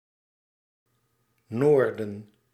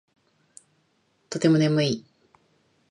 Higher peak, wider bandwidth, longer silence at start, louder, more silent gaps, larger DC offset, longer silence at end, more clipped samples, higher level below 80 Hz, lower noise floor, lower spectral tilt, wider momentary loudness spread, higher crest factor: about the same, -10 dBFS vs -8 dBFS; about the same, 11 kHz vs 10.5 kHz; first, 1.5 s vs 1.3 s; about the same, -23 LUFS vs -23 LUFS; neither; neither; second, 0.3 s vs 0.9 s; neither; second, -76 dBFS vs -70 dBFS; first, -72 dBFS vs -68 dBFS; first, -8.5 dB/octave vs -6 dB/octave; first, 16 LU vs 13 LU; about the same, 20 dB vs 20 dB